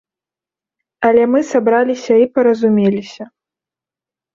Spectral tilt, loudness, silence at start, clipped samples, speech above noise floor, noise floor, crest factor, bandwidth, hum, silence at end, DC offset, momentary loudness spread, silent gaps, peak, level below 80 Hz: -6.5 dB/octave; -14 LUFS; 1 s; under 0.1%; 76 dB; -89 dBFS; 14 dB; 7.4 kHz; none; 1.1 s; under 0.1%; 9 LU; none; -2 dBFS; -60 dBFS